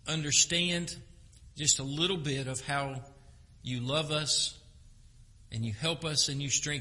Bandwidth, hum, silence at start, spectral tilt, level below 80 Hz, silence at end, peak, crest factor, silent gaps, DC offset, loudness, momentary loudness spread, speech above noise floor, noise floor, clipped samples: 11.5 kHz; none; 0.05 s; -2.5 dB/octave; -56 dBFS; 0 s; -10 dBFS; 22 dB; none; under 0.1%; -29 LUFS; 15 LU; 24 dB; -56 dBFS; under 0.1%